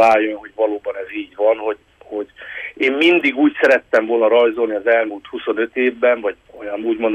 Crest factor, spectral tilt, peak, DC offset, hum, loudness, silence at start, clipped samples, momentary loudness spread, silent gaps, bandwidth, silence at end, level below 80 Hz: 14 dB; -4.5 dB/octave; -2 dBFS; under 0.1%; none; -17 LUFS; 0 s; under 0.1%; 15 LU; none; 9.8 kHz; 0 s; -60 dBFS